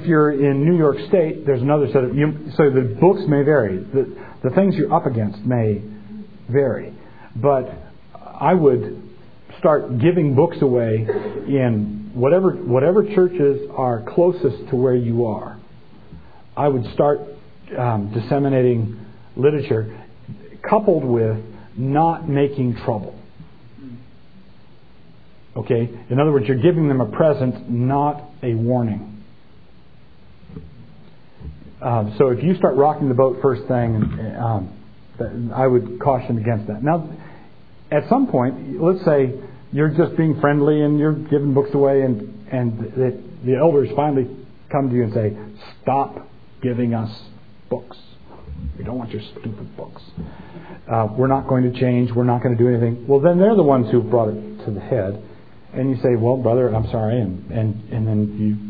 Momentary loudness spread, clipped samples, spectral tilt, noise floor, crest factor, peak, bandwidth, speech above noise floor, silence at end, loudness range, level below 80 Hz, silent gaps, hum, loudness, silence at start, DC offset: 17 LU; under 0.1%; -12 dB/octave; -49 dBFS; 18 dB; 0 dBFS; 4.9 kHz; 31 dB; 0 s; 8 LU; -48 dBFS; none; none; -19 LUFS; 0 s; 0.8%